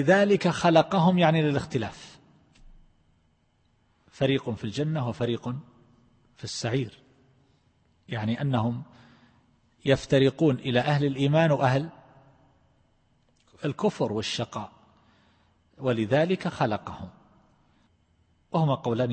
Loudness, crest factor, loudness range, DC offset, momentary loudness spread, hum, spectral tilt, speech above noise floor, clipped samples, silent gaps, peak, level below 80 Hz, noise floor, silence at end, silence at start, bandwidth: -26 LUFS; 20 dB; 8 LU; under 0.1%; 16 LU; none; -6.5 dB/octave; 42 dB; under 0.1%; none; -6 dBFS; -60 dBFS; -67 dBFS; 0 s; 0 s; 8.8 kHz